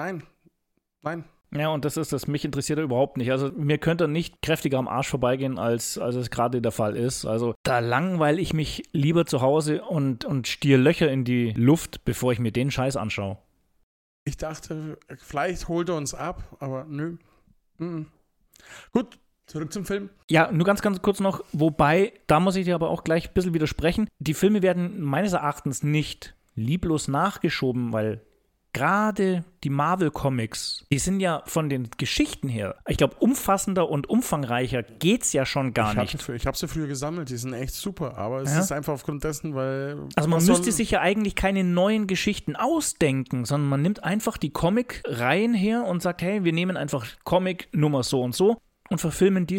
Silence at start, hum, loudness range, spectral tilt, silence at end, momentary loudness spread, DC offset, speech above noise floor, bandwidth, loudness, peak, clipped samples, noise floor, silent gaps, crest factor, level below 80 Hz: 0 s; none; 8 LU; -5.5 dB/octave; 0 s; 11 LU; under 0.1%; 51 dB; 17 kHz; -25 LUFS; -4 dBFS; under 0.1%; -75 dBFS; 7.56-7.64 s, 13.83-14.26 s, 20.24-20.28 s; 20 dB; -46 dBFS